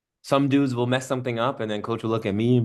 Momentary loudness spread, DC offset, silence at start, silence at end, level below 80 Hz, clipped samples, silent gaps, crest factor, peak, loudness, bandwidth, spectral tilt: 7 LU; under 0.1%; 0.25 s; 0 s; -68 dBFS; under 0.1%; none; 18 dB; -6 dBFS; -24 LUFS; 12.5 kHz; -6.5 dB/octave